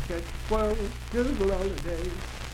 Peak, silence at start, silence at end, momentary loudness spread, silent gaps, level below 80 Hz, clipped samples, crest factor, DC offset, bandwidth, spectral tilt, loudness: -14 dBFS; 0 s; 0 s; 8 LU; none; -34 dBFS; under 0.1%; 16 dB; under 0.1%; 16.5 kHz; -6 dB/octave; -30 LUFS